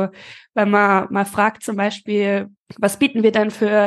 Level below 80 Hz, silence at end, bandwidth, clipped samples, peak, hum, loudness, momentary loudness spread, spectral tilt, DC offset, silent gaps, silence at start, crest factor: -62 dBFS; 0 s; 12.5 kHz; under 0.1%; -2 dBFS; none; -18 LUFS; 8 LU; -5.5 dB/octave; under 0.1%; 2.58-2.66 s; 0 s; 16 dB